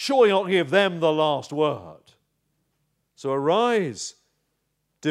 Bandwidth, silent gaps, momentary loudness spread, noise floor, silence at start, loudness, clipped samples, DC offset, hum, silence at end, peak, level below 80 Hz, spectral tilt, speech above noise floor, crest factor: 13 kHz; none; 15 LU; -75 dBFS; 0 s; -22 LUFS; under 0.1%; under 0.1%; none; 0 s; -6 dBFS; -76 dBFS; -4.5 dB/octave; 53 dB; 18 dB